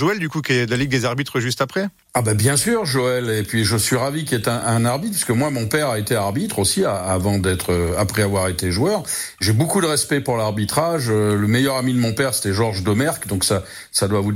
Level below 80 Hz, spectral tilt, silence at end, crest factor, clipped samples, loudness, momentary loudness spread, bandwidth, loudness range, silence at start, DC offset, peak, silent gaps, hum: -46 dBFS; -4.5 dB/octave; 0 s; 16 dB; under 0.1%; -19 LUFS; 4 LU; 16.5 kHz; 1 LU; 0 s; under 0.1%; -4 dBFS; none; none